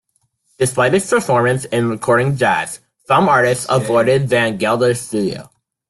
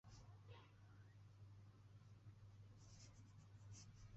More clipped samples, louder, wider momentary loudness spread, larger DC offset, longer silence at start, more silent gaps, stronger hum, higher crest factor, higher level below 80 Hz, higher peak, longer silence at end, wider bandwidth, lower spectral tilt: neither; first, -16 LUFS vs -65 LUFS; about the same, 7 LU vs 5 LU; neither; first, 0.6 s vs 0.05 s; neither; neither; about the same, 14 dB vs 14 dB; first, -52 dBFS vs -74 dBFS; first, -2 dBFS vs -50 dBFS; first, 0.45 s vs 0 s; first, 12.5 kHz vs 8 kHz; about the same, -5 dB/octave vs -6 dB/octave